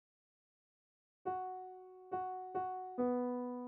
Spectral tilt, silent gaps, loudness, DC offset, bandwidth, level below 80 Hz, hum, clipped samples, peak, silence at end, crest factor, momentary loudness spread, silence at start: -7 dB/octave; none; -41 LUFS; under 0.1%; 3.2 kHz; -84 dBFS; none; under 0.1%; -26 dBFS; 0 s; 18 dB; 12 LU; 1.25 s